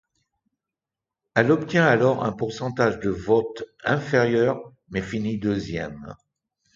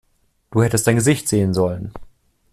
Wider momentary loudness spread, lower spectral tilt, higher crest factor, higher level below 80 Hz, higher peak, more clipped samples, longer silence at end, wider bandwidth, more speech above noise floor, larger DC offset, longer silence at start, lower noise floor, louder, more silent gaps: first, 13 LU vs 10 LU; first, -7 dB/octave vs -5.5 dB/octave; first, 22 dB vs 16 dB; second, -52 dBFS vs -46 dBFS; about the same, -2 dBFS vs -4 dBFS; neither; first, 0.6 s vs 0.45 s; second, 7.6 kHz vs 14.5 kHz; first, 66 dB vs 35 dB; neither; first, 1.35 s vs 0.5 s; first, -88 dBFS vs -52 dBFS; second, -23 LUFS vs -18 LUFS; neither